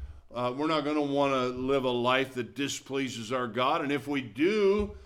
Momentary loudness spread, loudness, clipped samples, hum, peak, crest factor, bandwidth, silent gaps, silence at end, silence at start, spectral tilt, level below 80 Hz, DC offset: 7 LU; -29 LUFS; under 0.1%; none; -10 dBFS; 18 dB; 15 kHz; none; 0 s; 0 s; -5 dB/octave; -52 dBFS; under 0.1%